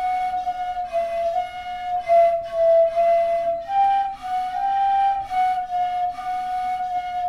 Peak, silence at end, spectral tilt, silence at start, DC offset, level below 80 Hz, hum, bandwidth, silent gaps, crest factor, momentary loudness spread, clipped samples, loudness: -8 dBFS; 0 s; -3.5 dB/octave; 0 s; under 0.1%; -52 dBFS; none; 11 kHz; none; 12 dB; 9 LU; under 0.1%; -22 LUFS